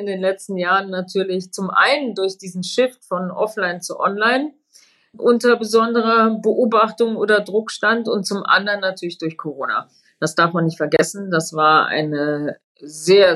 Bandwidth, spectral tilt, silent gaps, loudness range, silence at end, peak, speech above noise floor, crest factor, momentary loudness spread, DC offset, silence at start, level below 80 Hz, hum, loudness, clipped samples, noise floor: 13 kHz; -4.5 dB/octave; 12.64-12.75 s; 3 LU; 0 s; -4 dBFS; 35 dB; 16 dB; 10 LU; under 0.1%; 0 s; -68 dBFS; none; -18 LUFS; under 0.1%; -53 dBFS